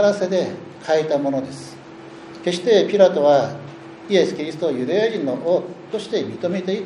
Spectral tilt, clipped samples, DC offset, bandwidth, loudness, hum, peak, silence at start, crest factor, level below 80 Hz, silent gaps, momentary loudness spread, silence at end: -5.5 dB/octave; under 0.1%; under 0.1%; 11 kHz; -20 LUFS; none; 0 dBFS; 0 s; 20 dB; -66 dBFS; none; 21 LU; 0 s